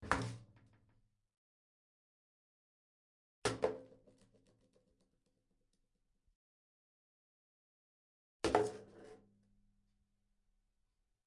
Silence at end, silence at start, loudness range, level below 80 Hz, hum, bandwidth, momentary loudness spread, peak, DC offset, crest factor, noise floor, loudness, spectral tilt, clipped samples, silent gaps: 2.1 s; 0 s; 5 LU; -66 dBFS; none; 11.5 kHz; 23 LU; -14 dBFS; under 0.1%; 32 dB; -83 dBFS; -39 LUFS; -4.5 dB/octave; under 0.1%; 1.37-3.42 s, 6.35-8.40 s